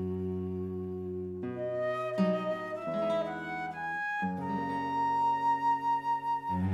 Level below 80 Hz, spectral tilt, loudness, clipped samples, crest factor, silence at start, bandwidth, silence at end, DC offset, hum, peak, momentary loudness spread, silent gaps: -66 dBFS; -7.5 dB/octave; -32 LUFS; under 0.1%; 16 dB; 0 s; 12 kHz; 0 s; under 0.1%; none; -16 dBFS; 9 LU; none